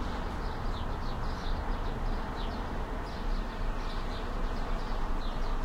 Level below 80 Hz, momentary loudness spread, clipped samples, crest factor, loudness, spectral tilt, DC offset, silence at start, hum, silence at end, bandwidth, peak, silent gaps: -34 dBFS; 1 LU; under 0.1%; 10 dB; -37 LUFS; -6 dB/octave; under 0.1%; 0 s; none; 0 s; 8.4 kHz; -22 dBFS; none